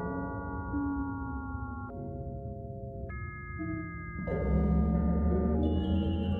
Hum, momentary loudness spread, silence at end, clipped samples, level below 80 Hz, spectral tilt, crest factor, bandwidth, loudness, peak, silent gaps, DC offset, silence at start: none; 12 LU; 0 s; under 0.1%; -38 dBFS; -11 dB/octave; 14 dB; 3.7 kHz; -33 LUFS; -18 dBFS; none; under 0.1%; 0 s